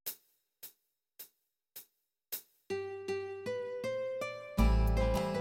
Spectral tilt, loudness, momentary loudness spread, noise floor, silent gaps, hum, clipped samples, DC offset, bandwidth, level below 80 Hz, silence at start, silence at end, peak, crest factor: -6 dB/octave; -36 LUFS; 21 LU; -74 dBFS; none; none; under 0.1%; under 0.1%; 17 kHz; -38 dBFS; 0.05 s; 0 s; -16 dBFS; 20 dB